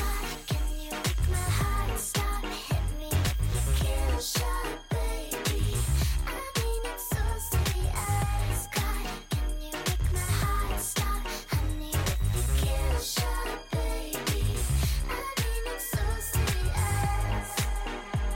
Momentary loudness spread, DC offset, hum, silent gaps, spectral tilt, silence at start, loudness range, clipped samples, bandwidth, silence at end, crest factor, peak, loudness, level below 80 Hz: 5 LU; under 0.1%; none; none; -4 dB/octave; 0 s; 1 LU; under 0.1%; 17 kHz; 0 s; 12 dB; -16 dBFS; -30 LUFS; -30 dBFS